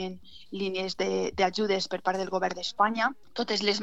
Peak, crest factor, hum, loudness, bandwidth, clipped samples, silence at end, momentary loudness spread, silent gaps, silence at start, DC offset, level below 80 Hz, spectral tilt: -8 dBFS; 20 dB; none; -29 LUFS; 8.2 kHz; under 0.1%; 0 s; 9 LU; none; 0 s; 0.4%; -60 dBFS; -4 dB/octave